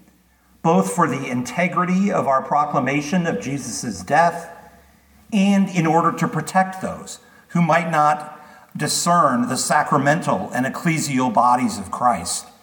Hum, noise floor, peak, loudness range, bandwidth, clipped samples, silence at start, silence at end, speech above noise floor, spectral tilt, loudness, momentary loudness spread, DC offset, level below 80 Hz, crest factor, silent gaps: none; -56 dBFS; -2 dBFS; 3 LU; 19 kHz; under 0.1%; 0.65 s; 0.2 s; 37 dB; -5 dB/octave; -19 LUFS; 10 LU; under 0.1%; -58 dBFS; 18 dB; none